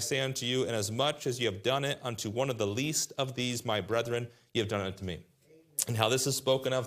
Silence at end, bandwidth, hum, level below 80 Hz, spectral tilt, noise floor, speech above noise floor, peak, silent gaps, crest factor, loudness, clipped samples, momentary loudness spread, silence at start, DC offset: 0 s; 15.5 kHz; none; -68 dBFS; -3.5 dB/octave; -61 dBFS; 30 dB; -6 dBFS; none; 26 dB; -31 LUFS; under 0.1%; 7 LU; 0 s; under 0.1%